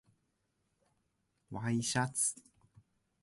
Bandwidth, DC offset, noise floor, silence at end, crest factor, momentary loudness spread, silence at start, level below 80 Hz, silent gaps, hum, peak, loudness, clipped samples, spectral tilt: 12 kHz; under 0.1%; -81 dBFS; 0.85 s; 22 dB; 15 LU; 1.5 s; -72 dBFS; none; none; -18 dBFS; -34 LUFS; under 0.1%; -3.5 dB/octave